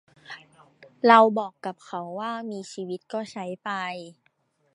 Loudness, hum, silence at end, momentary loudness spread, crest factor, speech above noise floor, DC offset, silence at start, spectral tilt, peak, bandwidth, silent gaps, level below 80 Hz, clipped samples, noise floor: -25 LUFS; none; 0.6 s; 24 LU; 24 dB; 44 dB; under 0.1%; 0.3 s; -5 dB/octave; -2 dBFS; 11 kHz; none; -82 dBFS; under 0.1%; -69 dBFS